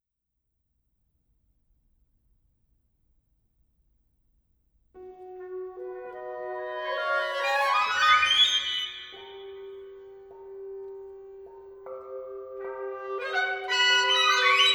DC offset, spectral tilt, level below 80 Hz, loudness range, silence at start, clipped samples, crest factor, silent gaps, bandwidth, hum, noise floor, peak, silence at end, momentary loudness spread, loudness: under 0.1%; 0.5 dB/octave; -70 dBFS; 19 LU; 4.95 s; under 0.1%; 22 dB; none; over 20 kHz; none; -82 dBFS; -8 dBFS; 0 s; 25 LU; -23 LUFS